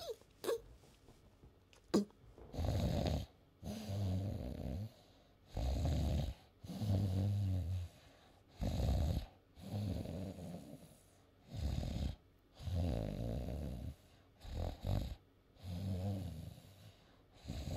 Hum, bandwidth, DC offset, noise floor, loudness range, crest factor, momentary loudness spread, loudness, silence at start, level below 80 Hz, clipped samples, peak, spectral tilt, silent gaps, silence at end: none; 15.5 kHz; under 0.1%; -67 dBFS; 5 LU; 20 dB; 19 LU; -42 LUFS; 0 s; -48 dBFS; under 0.1%; -20 dBFS; -7 dB/octave; none; 0 s